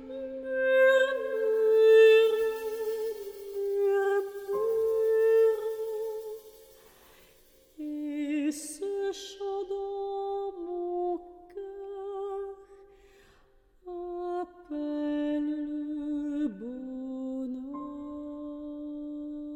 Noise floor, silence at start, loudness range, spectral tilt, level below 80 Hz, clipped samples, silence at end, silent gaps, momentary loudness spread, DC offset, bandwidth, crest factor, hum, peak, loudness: -62 dBFS; 0 s; 14 LU; -3.5 dB/octave; -64 dBFS; under 0.1%; 0 s; none; 17 LU; under 0.1%; over 20 kHz; 18 dB; none; -10 dBFS; -29 LUFS